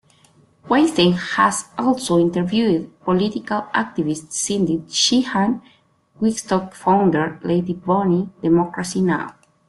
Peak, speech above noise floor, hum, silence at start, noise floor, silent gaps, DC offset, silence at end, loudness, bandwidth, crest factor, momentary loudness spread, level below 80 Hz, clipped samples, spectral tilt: -2 dBFS; 36 dB; none; 0.65 s; -54 dBFS; none; under 0.1%; 0.4 s; -19 LUFS; 12 kHz; 18 dB; 7 LU; -56 dBFS; under 0.1%; -4.5 dB/octave